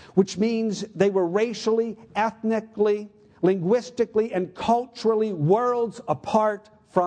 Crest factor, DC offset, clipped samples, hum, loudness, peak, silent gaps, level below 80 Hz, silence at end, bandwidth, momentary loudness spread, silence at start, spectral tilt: 18 dB; under 0.1%; under 0.1%; none; -24 LUFS; -6 dBFS; none; -62 dBFS; 0 s; 9.4 kHz; 6 LU; 0.15 s; -6.5 dB/octave